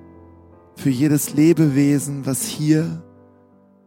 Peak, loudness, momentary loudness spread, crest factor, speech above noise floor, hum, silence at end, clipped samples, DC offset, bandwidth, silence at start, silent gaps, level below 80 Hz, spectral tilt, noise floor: -4 dBFS; -18 LUFS; 9 LU; 16 dB; 35 dB; none; 0.85 s; under 0.1%; under 0.1%; 17 kHz; 0.75 s; none; -60 dBFS; -6 dB/octave; -52 dBFS